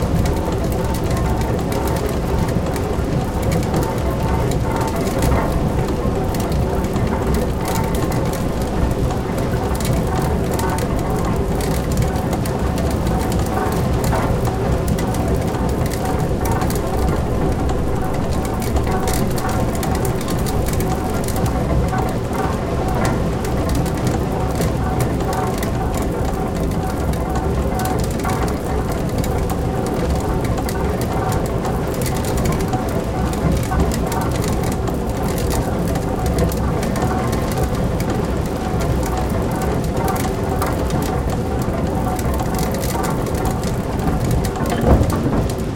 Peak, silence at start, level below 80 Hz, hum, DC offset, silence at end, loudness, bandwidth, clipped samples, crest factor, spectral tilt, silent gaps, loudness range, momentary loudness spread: 0 dBFS; 0 s; -24 dBFS; none; under 0.1%; 0 s; -20 LUFS; 17 kHz; under 0.1%; 18 dB; -6.5 dB/octave; none; 1 LU; 2 LU